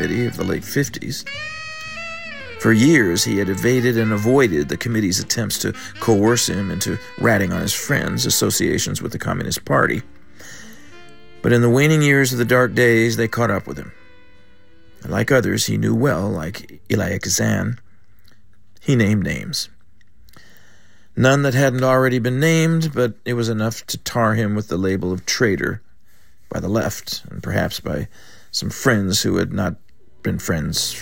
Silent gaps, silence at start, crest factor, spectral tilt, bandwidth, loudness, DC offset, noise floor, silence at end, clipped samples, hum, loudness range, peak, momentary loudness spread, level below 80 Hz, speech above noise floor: none; 0 s; 18 dB; -4.5 dB/octave; 16.5 kHz; -19 LUFS; 0.9%; -57 dBFS; 0 s; under 0.1%; none; 5 LU; -2 dBFS; 14 LU; -48 dBFS; 38 dB